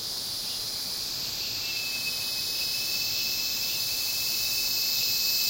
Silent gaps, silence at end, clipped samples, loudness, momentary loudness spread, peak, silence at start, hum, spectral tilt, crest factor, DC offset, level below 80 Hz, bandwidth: none; 0 s; under 0.1%; -26 LUFS; 6 LU; -14 dBFS; 0 s; none; 1 dB/octave; 16 dB; under 0.1%; -60 dBFS; 16.5 kHz